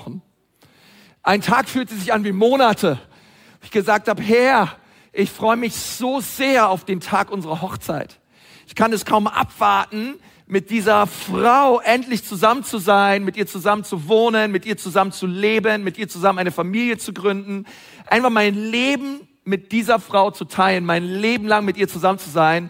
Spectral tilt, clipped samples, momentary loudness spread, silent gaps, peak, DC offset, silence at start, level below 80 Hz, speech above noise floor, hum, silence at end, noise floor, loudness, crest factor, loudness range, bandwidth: -4.5 dB/octave; under 0.1%; 11 LU; none; -2 dBFS; under 0.1%; 0 s; -58 dBFS; 38 dB; none; 0 s; -57 dBFS; -18 LUFS; 18 dB; 4 LU; 16.5 kHz